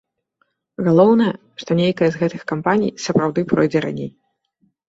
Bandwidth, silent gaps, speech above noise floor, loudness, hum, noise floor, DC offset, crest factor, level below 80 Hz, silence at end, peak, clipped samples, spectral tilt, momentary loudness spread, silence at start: 7.8 kHz; none; 50 dB; -18 LUFS; none; -67 dBFS; under 0.1%; 18 dB; -58 dBFS; 0.8 s; -2 dBFS; under 0.1%; -7 dB/octave; 14 LU; 0.8 s